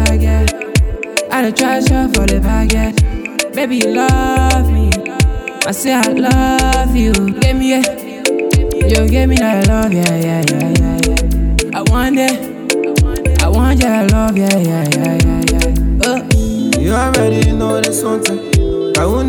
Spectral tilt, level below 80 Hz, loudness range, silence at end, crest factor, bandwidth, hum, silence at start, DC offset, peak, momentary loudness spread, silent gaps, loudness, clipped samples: -5 dB/octave; -16 dBFS; 1 LU; 0 s; 12 dB; 19.5 kHz; none; 0 s; under 0.1%; 0 dBFS; 4 LU; none; -13 LUFS; under 0.1%